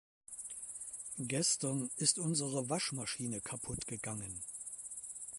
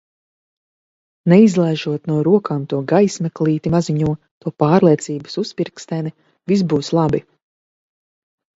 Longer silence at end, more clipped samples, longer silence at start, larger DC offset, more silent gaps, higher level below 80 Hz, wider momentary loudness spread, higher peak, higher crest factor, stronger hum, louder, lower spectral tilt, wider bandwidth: second, 0 s vs 1.35 s; neither; second, 0.3 s vs 1.25 s; neither; second, none vs 4.31-4.41 s; second, -66 dBFS vs -52 dBFS; about the same, 12 LU vs 12 LU; second, -14 dBFS vs 0 dBFS; first, 26 dB vs 18 dB; neither; second, -37 LUFS vs -17 LUFS; second, -3 dB/octave vs -7 dB/octave; first, 12 kHz vs 8 kHz